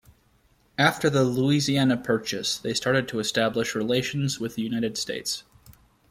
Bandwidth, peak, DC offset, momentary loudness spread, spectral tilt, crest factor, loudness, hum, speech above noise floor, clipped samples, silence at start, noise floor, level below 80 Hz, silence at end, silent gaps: 16 kHz; -6 dBFS; under 0.1%; 7 LU; -4.5 dB/octave; 20 dB; -25 LUFS; none; 38 dB; under 0.1%; 0.8 s; -63 dBFS; -58 dBFS; 0.4 s; none